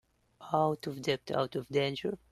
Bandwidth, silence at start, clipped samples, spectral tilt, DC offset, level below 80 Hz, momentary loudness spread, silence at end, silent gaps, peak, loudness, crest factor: 13 kHz; 0.4 s; under 0.1%; -6 dB/octave; under 0.1%; -68 dBFS; 4 LU; 0.15 s; none; -14 dBFS; -33 LUFS; 20 dB